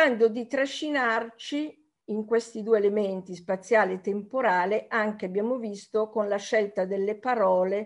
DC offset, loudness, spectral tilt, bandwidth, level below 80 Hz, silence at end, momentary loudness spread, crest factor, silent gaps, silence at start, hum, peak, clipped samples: under 0.1%; -27 LUFS; -5 dB/octave; 11 kHz; -78 dBFS; 0 s; 9 LU; 16 dB; none; 0 s; none; -10 dBFS; under 0.1%